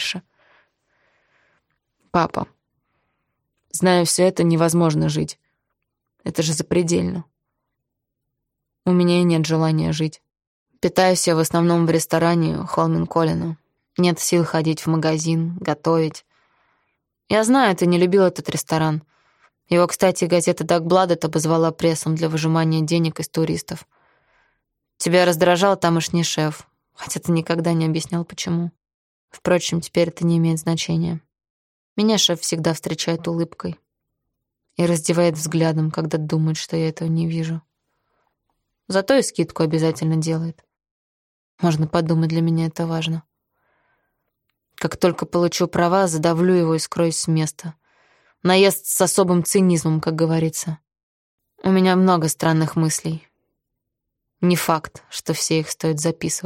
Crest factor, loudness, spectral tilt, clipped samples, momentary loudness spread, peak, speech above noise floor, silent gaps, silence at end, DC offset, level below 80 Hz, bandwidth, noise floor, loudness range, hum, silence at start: 18 dB; -20 LUFS; -5 dB/octave; under 0.1%; 11 LU; -2 dBFS; 61 dB; 10.47-10.66 s, 28.94-29.28 s, 31.50-31.96 s, 40.91-41.58 s, 51.03-51.38 s; 0 s; under 0.1%; -56 dBFS; 16.5 kHz; -80 dBFS; 4 LU; none; 0 s